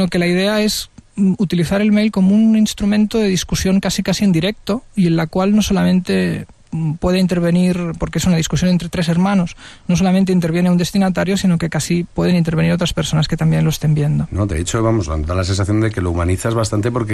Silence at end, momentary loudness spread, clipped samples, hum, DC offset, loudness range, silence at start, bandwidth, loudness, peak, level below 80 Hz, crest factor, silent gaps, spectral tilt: 0 s; 5 LU; under 0.1%; none; under 0.1%; 2 LU; 0 s; 13.5 kHz; -16 LUFS; -4 dBFS; -34 dBFS; 10 dB; none; -6 dB/octave